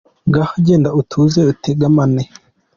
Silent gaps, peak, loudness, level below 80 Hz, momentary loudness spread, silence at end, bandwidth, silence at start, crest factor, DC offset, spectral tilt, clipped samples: none; -2 dBFS; -14 LUFS; -46 dBFS; 4 LU; 0.5 s; 7.2 kHz; 0.25 s; 12 dB; under 0.1%; -8 dB/octave; under 0.1%